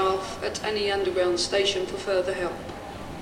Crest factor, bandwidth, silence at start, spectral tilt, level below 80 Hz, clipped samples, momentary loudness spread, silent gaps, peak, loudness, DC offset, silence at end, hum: 16 dB; 15.5 kHz; 0 s; -3.5 dB/octave; -50 dBFS; under 0.1%; 13 LU; none; -10 dBFS; -26 LUFS; under 0.1%; 0 s; none